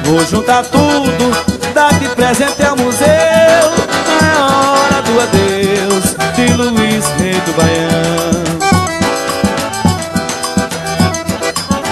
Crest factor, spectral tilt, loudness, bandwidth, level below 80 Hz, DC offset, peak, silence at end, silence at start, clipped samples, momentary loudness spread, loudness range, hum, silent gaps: 12 dB; -4 dB/octave; -11 LUFS; 13.5 kHz; -36 dBFS; under 0.1%; 0 dBFS; 0 s; 0 s; under 0.1%; 6 LU; 4 LU; none; none